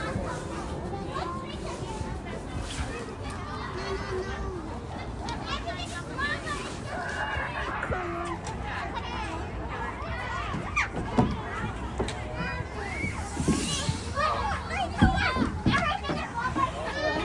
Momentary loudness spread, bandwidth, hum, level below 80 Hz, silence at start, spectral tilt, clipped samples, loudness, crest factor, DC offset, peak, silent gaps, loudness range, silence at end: 9 LU; 11.5 kHz; none; -40 dBFS; 0 s; -5 dB/octave; under 0.1%; -31 LUFS; 24 dB; under 0.1%; -8 dBFS; none; 7 LU; 0 s